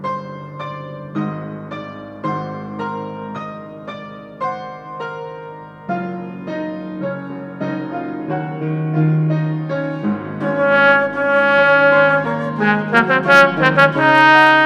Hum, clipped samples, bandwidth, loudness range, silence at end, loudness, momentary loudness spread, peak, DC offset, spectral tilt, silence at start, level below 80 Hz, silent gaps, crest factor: none; under 0.1%; 11 kHz; 15 LU; 0 s; -16 LUFS; 19 LU; 0 dBFS; under 0.1%; -6.5 dB/octave; 0 s; -60 dBFS; none; 16 dB